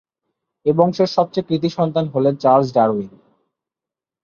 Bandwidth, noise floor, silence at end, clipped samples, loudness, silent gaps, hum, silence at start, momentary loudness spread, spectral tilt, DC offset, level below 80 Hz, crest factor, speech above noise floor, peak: 7.2 kHz; -88 dBFS; 1.15 s; under 0.1%; -18 LUFS; none; none; 0.65 s; 7 LU; -8 dB/octave; under 0.1%; -60 dBFS; 18 dB; 71 dB; -2 dBFS